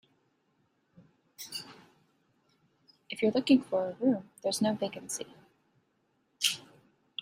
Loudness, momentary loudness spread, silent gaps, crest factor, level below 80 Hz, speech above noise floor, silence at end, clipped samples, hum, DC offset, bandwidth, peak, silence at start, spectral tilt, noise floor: -31 LUFS; 17 LU; none; 24 dB; -76 dBFS; 45 dB; 0.6 s; under 0.1%; none; under 0.1%; 16 kHz; -10 dBFS; 1.4 s; -3.5 dB/octave; -74 dBFS